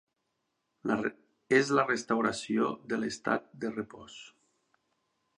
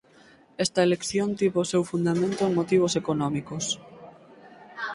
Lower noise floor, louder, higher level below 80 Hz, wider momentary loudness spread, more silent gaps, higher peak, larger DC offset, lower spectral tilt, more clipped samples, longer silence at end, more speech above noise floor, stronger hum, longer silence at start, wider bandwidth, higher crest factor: first, -81 dBFS vs -55 dBFS; second, -31 LUFS vs -25 LUFS; second, -72 dBFS vs -62 dBFS; first, 15 LU vs 8 LU; neither; about the same, -10 dBFS vs -10 dBFS; neither; about the same, -4.5 dB/octave vs -5 dB/octave; neither; first, 1.1 s vs 0 s; first, 51 dB vs 30 dB; neither; first, 0.85 s vs 0.6 s; about the same, 10.5 kHz vs 11.5 kHz; first, 22 dB vs 16 dB